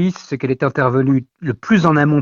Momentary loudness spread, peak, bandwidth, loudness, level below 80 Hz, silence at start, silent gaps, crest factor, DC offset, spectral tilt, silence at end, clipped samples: 10 LU; 0 dBFS; 7.2 kHz; -17 LUFS; -50 dBFS; 0 s; none; 16 dB; under 0.1%; -8 dB/octave; 0 s; under 0.1%